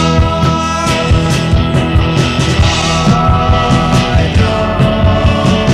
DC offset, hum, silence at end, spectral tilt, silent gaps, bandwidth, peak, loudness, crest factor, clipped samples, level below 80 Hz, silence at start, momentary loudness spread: 0.5%; none; 0 s; -5.5 dB/octave; none; 13 kHz; 0 dBFS; -11 LUFS; 10 dB; under 0.1%; -18 dBFS; 0 s; 2 LU